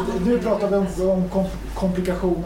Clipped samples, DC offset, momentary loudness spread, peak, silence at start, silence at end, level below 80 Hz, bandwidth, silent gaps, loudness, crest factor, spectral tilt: under 0.1%; under 0.1%; 4 LU; -8 dBFS; 0 s; 0 s; -34 dBFS; 16 kHz; none; -22 LUFS; 14 dB; -7.5 dB/octave